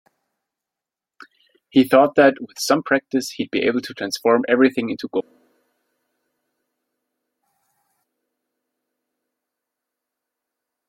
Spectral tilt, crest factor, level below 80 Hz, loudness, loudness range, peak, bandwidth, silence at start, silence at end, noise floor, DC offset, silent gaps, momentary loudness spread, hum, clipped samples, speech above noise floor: -4.5 dB/octave; 22 dB; -66 dBFS; -19 LUFS; 8 LU; -2 dBFS; 16.5 kHz; 1.75 s; 5.7 s; -87 dBFS; under 0.1%; none; 11 LU; none; under 0.1%; 69 dB